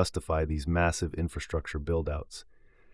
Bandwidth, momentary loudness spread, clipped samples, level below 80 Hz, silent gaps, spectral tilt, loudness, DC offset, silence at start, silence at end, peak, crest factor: 12 kHz; 10 LU; under 0.1%; -42 dBFS; none; -5.5 dB/octave; -31 LUFS; under 0.1%; 0 s; 0.5 s; -10 dBFS; 22 dB